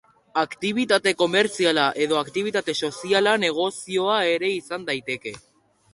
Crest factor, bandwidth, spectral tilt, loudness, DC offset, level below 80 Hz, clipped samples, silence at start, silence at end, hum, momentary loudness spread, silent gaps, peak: 18 dB; 11.5 kHz; -3.5 dB/octave; -22 LUFS; under 0.1%; -66 dBFS; under 0.1%; 0.35 s; 0.55 s; none; 8 LU; none; -4 dBFS